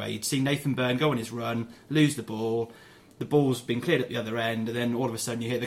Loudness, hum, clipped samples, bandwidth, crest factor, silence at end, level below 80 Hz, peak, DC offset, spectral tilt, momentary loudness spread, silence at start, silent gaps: -28 LUFS; none; under 0.1%; 16 kHz; 18 dB; 0 s; -64 dBFS; -10 dBFS; under 0.1%; -5 dB/octave; 7 LU; 0 s; none